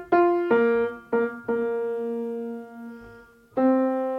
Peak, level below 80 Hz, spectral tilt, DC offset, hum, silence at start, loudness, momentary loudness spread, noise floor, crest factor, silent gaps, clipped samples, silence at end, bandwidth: -8 dBFS; -64 dBFS; -8 dB/octave; under 0.1%; none; 0 s; -24 LUFS; 18 LU; -49 dBFS; 16 dB; none; under 0.1%; 0 s; 5.4 kHz